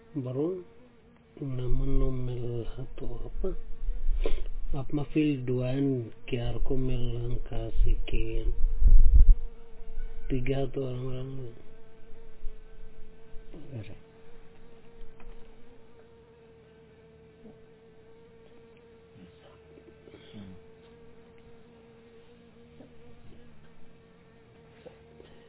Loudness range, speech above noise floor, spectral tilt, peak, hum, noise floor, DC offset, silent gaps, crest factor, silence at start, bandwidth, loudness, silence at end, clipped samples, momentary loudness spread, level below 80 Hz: 25 LU; 31 dB; -11 dB/octave; -6 dBFS; none; -57 dBFS; under 0.1%; none; 20 dB; 0.15 s; 3.9 kHz; -32 LUFS; 1.6 s; under 0.1%; 26 LU; -30 dBFS